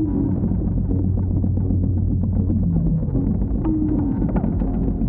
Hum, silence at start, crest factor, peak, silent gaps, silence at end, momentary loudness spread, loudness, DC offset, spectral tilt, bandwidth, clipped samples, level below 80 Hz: none; 0 s; 12 dB; -6 dBFS; none; 0 s; 2 LU; -21 LUFS; under 0.1%; -15 dB/octave; 2.3 kHz; under 0.1%; -26 dBFS